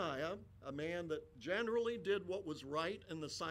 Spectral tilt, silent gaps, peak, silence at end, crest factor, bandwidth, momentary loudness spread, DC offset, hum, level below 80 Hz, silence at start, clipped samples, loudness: -4.5 dB/octave; none; -26 dBFS; 0 s; 16 dB; 14 kHz; 8 LU; under 0.1%; none; -70 dBFS; 0 s; under 0.1%; -42 LUFS